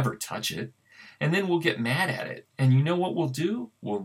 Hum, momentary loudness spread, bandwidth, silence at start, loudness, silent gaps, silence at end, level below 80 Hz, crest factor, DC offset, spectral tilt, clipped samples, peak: none; 11 LU; 16 kHz; 0 s; -27 LUFS; none; 0 s; -72 dBFS; 18 dB; under 0.1%; -5.5 dB/octave; under 0.1%; -8 dBFS